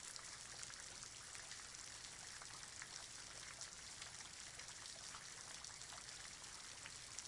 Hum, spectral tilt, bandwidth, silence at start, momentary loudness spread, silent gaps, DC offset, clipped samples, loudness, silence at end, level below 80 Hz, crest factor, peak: none; 0 dB/octave; 12 kHz; 0 s; 1 LU; none; under 0.1%; under 0.1%; -52 LUFS; 0 s; -74 dBFS; 28 dB; -26 dBFS